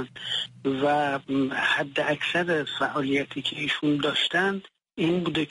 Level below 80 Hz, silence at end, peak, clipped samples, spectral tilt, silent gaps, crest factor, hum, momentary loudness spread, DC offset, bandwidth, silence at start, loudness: -64 dBFS; 0.05 s; -10 dBFS; under 0.1%; -5 dB/octave; none; 16 dB; none; 5 LU; under 0.1%; 11.5 kHz; 0 s; -25 LUFS